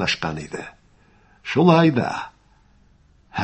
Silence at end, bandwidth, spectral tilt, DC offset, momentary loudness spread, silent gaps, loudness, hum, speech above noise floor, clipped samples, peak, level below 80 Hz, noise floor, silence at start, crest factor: 0 s; 8.6 kHz; -6.5 dB/octave; under 0.1%; 22 LU; none; -19 LUFS; 50 Hz at -60 dBFS; 37 dB; under 0.1%; -2 dBFS; -52 dBFS; -56 dBFS; 0 s; 22 dB